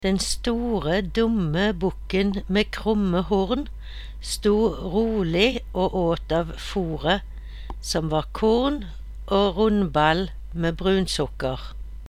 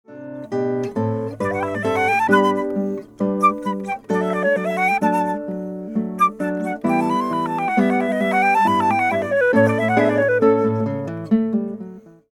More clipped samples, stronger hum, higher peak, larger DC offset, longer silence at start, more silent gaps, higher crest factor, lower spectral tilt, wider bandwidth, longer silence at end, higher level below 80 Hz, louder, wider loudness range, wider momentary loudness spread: neither; neither; about the same, -4 dBFS vs -4 dBFS; neither; about the same, 0 s vs 0.1 s; neither; about the same, 20 dB vs 16 dB; second, -5.5 dB/octave vs -7 dB/octave; second, 14.5 kHz vs 16 kHz; second, 0 s vs 0.2 s; first, -36 dBFS vs -60 dBFS; second, -23 LUFS vs -19 LUFS; about the same, 2 LU vs 4 LU; about the same, 12 LU vs 10 LU